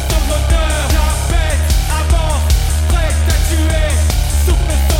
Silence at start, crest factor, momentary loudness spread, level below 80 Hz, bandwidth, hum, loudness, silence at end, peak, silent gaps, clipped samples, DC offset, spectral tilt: 0 s; 12 dB; 1 LU; -14 dBFS; 17 kHz; none; -15 LUFS; 0 s; -2 dBFS; none; under 0.1%; under 0.1%; -4.5 dB/octave